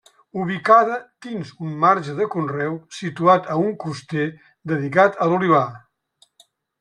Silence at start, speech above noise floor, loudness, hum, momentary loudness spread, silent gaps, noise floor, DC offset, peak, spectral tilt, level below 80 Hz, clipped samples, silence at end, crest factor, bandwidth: 0.35 s; 41 dB; -20 LUFS; none; 15 LU; none; -60 dBFS; under 0.1%; -2 dBFS; -7 dB/octave; -66 dBFS; under 0.1%; 1.05 s; 18 dB; 11 kHz